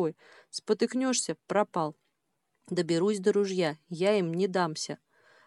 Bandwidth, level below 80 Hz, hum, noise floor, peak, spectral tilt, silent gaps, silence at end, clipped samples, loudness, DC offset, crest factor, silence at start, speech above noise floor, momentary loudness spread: 12 kHz; -82 dBFS; none; -79 dBFS; -12 dBFS; -4.5 dB/octave; none; 0.5 s; under 0.1%; -29 LUFS; under 0.1%; 18 dB; 0 s; 51 dB; 9 LU